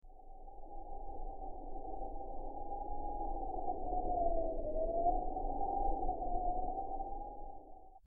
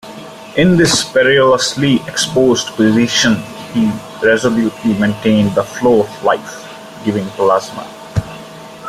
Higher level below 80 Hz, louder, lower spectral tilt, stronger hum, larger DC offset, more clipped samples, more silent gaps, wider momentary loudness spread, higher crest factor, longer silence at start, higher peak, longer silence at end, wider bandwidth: about the same, -42 dBFS vs -44 dBFS; second, -41 LUFS vs -14 LUFS; first, -10 dB/octave vs -4.5 dB/octave; neither; neither; neither; neither; about the same, 17 LU vs 18 LU; about the same, 16 dB vs 14 dB; about the same, 0.05 s vs 0.05 s; second, -22 dBFS vs 0 dBFS; about the same, 0.05 s vs 0 s; second, 1.1 kHz vs 15 kHz